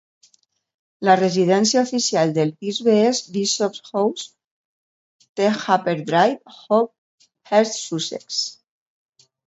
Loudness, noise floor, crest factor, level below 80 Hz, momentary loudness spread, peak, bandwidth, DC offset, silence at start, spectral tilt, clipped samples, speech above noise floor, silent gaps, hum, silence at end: -20 LUFS; -62 dBFS; 20 dB; -70 dBFS; 9 LU; 0 dBFS; 8.2 kHz; under 0.1%; 1 s; -4 dB/octave; under 0.1%; 43 dB; 4.44-5.20 s, 5.29-5.35 s, 6.98-7.18 s; none; 0.95 s